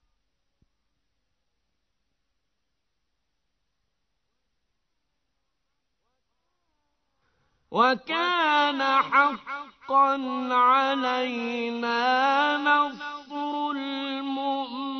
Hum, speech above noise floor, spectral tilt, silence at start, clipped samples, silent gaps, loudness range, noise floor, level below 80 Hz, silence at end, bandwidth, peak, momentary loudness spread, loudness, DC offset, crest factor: none; 57 dB; -3.5 dB/octave; 7.7 s; under 0.1%; none; 6 LU; -81 dBFS; -76 dBFS; 0 s; 6.4 kHz; -8 dBFS; 11 LU; -24 LUFS; under 0.1%; 20 dB